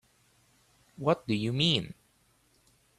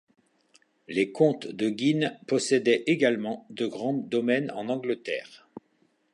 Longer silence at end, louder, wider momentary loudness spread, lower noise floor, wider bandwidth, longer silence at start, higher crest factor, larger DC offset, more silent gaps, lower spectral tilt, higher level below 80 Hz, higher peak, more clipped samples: first, 1.05 s vs 0.55 s; about the same, -29 LUFS vs -27 LUFS; second, 7 LU vs 10 LU; about the same, -68 dBFS vs -68 dBFS; first, 13 kHz vs 11 kHz; about the same, 1 s vs 0.9 s; about the same, 22 dB vs 20 dB; neither; neither; about the same, -5.5 dB/octave vs -5 dB/octave; first, -64 dBFS vs -78 dBFS; second, -12 dBFS vs -8 dBFS; neither